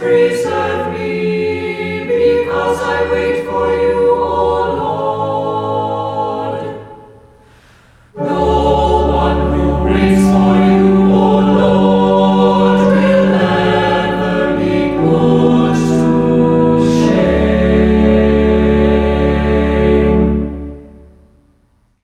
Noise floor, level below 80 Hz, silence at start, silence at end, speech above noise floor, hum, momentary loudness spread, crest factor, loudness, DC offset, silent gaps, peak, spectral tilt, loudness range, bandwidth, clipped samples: -55 dBFS; -26 dBFS; 0 s; 1.15 s; 42 dB; none; 8 LU; 12 dB; -13 LUFS; under 0.1%; none; 0 dBFS; -7.5 dB/octave; 7 LU; 11 kHz; under 0.1%